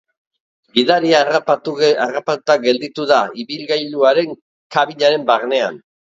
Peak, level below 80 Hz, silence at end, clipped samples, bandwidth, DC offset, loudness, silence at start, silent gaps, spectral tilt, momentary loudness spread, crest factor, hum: 0 dBFS; -68 dBFS; 0.25 s; under 0.1%; 7.8 kHz; under 0.1%; -16 LUFS; 0.75 s; 4.42-4.70 s; -4 dB/octave; 8 LU; 16 dB; none